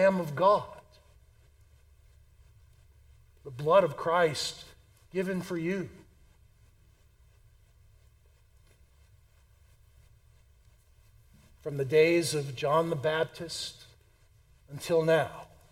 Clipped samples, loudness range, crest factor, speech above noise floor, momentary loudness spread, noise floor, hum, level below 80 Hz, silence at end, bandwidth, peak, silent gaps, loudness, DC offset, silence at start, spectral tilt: under 0.1%; 11 LU; 22 dB; 34 dB; 22 LU; -62 dBFS; none; -62 dBFS; 0.25 s; 16 kHz; -10 dBFS; none; -28 LUFS; under 0.1%; 0 s; -5 dB/octave